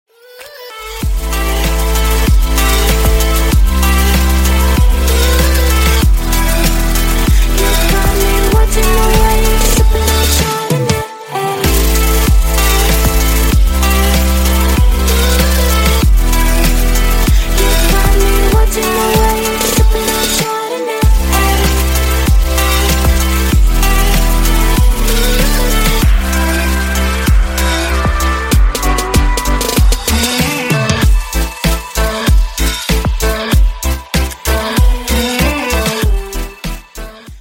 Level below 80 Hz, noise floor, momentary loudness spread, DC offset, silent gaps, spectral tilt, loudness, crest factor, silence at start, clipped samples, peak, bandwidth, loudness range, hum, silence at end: -12 dBFS; -35 dBFS; 5 LU; under 0.1%; none; -4 dB/octave; -12 LUFS; 10 dB; 0.35 s; under 0.1%; 0 dBFS; 16.5 kHz; 3 LU; none; 0 s